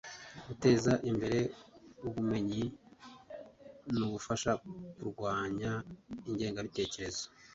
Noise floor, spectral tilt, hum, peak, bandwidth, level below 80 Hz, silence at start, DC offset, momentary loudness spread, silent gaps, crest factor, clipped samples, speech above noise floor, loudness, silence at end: -54 dBFS; -5.5 dB/octave; none; -14 dBFS; 8 kHz; -60 dBFS; 0.05 s; under 0.1%; 20 LU; none; 22 dB; under 0.1%; 20 dB; -35 LUFS; 0.05 s